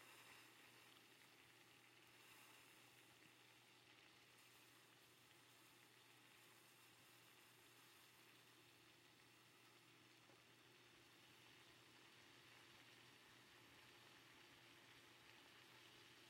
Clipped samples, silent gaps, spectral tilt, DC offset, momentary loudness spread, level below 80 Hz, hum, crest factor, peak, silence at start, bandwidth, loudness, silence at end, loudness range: under 0.1%; none; -2 dB/octave; under 0.1%; 4 LU; under -90 dBFS; none; 20 dB; -50 dBFS; 0 s; 16 kHz; -67 LUFS; 0 s; 2 LU